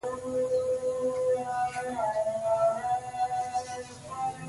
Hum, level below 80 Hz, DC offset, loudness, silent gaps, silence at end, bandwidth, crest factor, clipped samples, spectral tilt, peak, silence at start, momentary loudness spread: none; -62 dBFS; under 0.1%; -30 LUFS; none; 0 s; 11.5 kHz; 14 dB; under 0.1%; -4.5 dB/octave; -16 dBFS; 0.05 s; 8 LU